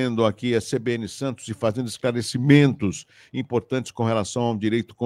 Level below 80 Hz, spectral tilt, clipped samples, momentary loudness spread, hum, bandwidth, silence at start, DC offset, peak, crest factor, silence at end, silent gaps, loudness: -62 dBFS; -6 dB/octave; under 0.1%; 13 LU; none; 12.5 kHz; 0 s; under 0.1%; -2 dBFS; 20 dB; 0 s; none; -23 LUFS